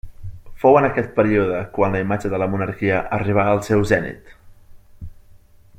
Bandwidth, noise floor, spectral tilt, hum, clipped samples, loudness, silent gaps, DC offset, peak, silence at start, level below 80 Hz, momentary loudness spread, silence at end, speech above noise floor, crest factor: 15.5 kHz; -47 dBFS; -7.5 dB/octave; none; under 0.1%; -19 LUFS; none; under 0.1%; -2 dBFS; 0.05 s; -42 dBFS; 8 LU; 0.4 s; 29 dB; 18 dB